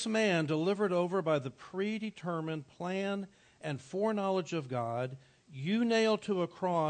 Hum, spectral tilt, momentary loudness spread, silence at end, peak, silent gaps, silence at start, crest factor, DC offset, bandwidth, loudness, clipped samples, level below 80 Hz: none; -6 dB/octave; 12 LU; 0 s; -18 dBFS; none; 0 s; 14 dB; under 0.1%; 9 kHz; -33 LUFS; under 0.1%; -78 dBFS